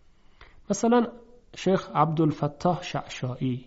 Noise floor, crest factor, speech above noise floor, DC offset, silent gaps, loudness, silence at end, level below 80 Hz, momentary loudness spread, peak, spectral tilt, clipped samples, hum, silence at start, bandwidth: -53 dBFS; 18 dB; 27 dB; under 0.1%; none; -26 LUFS; 0.05 s; -56 dBFS; 10 LU; -8 dBFS; -6.5 dB/octave; under 0.1%; none; 0.4 s; 8 kHz